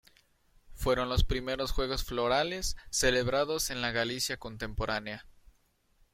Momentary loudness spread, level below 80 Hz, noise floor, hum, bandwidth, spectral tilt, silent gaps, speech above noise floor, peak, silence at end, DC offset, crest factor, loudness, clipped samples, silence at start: 8 LU; -40 dBFS; -69 dBFS; none; 16.5 kHz; -3.5 dB/octave; none; 39 dB; -12 dBFS; 0.85 s; under 0.1%; 20 dB; -31 LUFS; under 0.1%; 0.7 s